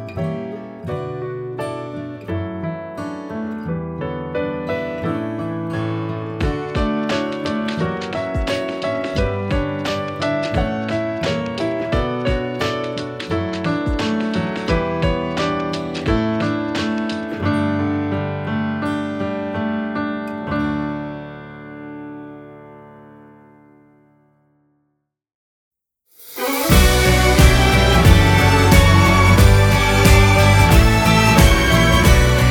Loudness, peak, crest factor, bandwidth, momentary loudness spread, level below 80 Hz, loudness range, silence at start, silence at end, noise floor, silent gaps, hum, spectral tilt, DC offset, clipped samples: -18 LUFS; 0 dBFS; 18 dB; over 20 kHz; 15 LU; -24 dBFS; 15 LU; 0 s; 0 s; -73 dBFS; 25.35-25.71 s; none; -5.5 dB/octave; under 0.1%; under 0.1%